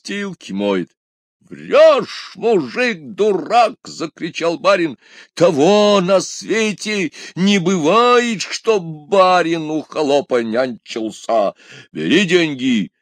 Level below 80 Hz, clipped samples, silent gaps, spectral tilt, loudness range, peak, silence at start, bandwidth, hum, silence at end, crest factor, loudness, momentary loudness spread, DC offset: -68 dBFS; under 0.1%; 0.97-1.40 s; -4.5 dB/octave; 3 LU; 0 dBFS; 0.05 s; 10.5 kHz; none; 0.15 s; 16 dB; -16 LUFS; 13 LU; under 0.1%